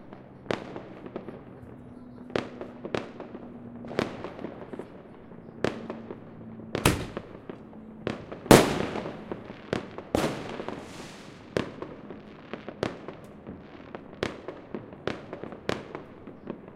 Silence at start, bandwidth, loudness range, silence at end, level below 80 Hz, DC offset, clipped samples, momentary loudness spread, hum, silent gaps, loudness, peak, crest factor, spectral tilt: 0 s; 16 kHz; 12 LU; 0 s; -50 dBFS; under 0.1%; under 0.1%; 17 LU; none; none; -31 LUFS; 0 dBFS; 32 dB; -5 dB/octave